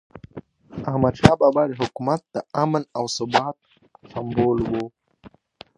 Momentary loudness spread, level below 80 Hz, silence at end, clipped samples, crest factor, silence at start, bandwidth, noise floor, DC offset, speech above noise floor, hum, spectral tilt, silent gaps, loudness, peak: 21 LU; -46 dBFS; 0.5 s; under 0.1%; 22 dB; 0.35 s; 11.5 kHz; -50 dBFS; under 0.1%; 29 dB; none; -6 dB/octave; none; -22 LUFS; 0 dBFS